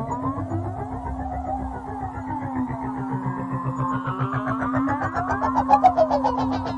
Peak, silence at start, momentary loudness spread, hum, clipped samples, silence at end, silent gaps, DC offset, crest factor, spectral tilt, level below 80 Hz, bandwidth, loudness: -4 dBFS; 0 s; 12 LU; none; under 0.1%; 0 s; none; under 0.1%; 20 dB; -8 dB/octave; -42 dBFS; 9.4 kHz; -24 LUFS